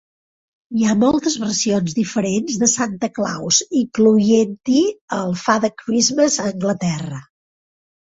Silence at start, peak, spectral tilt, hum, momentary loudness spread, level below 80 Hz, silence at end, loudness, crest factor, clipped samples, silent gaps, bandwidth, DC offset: 0.7 s; -2 dBFS; -4 dB/octave; none; 8 LU; -56 dBFS; 0.8 s; -18 LUFS; 18 dB; under 0.1%; 5.01-5.08 s; 8 kHz; under 0.1%